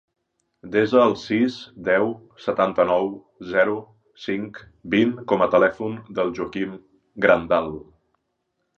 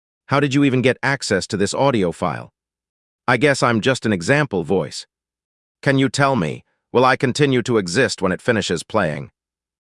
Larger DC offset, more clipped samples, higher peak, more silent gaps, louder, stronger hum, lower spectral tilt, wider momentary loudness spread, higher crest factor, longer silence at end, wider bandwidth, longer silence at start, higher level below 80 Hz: neither; neither; about the same, -2 dBFS vs 0 dBFS; second, none vs 2.89-3.19 s, 5.45-5.75 s; second, -22 LUFS vs -18 LUFS; neither; first, -6.5 dB/octave vs -5 dB/octave; first, 14 LU vs 9 LU; about the same, 20 dB vs 18 dB; first, 0.95 s vs 0.7 s; second, 7.4 kHz vs 12 kHz; first, 0.65 s vs 0.3 s; about the same, -56 dBFS vs -56 dBFS